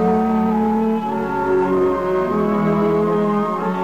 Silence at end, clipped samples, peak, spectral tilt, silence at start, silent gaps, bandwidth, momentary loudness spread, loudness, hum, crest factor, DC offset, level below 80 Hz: 0 s; under 0.1%; -8 dBFS; -8.5 dB/octave; 0 s; none; 14 kHz; 3 LU; -18 LUFS; none; 10 dB; 0.6%; -46 dBFS